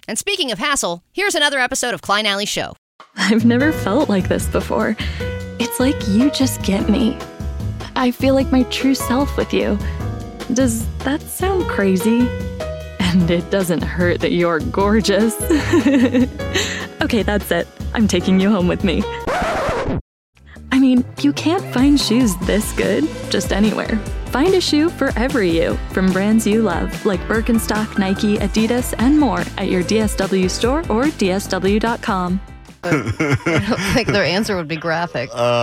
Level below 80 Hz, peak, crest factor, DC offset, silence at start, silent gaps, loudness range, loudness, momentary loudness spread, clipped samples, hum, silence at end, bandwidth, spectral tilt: -32 dBFS; -2 dBFS; 16 dB; under 0.1%; 0.1 s; 2.78-2.99 s, 20.01-20.33 s; 2 LU; -18 LUFS; 8 LU; under 0.1%; none; 0 s; 16.5 kHz; -5 dB/octave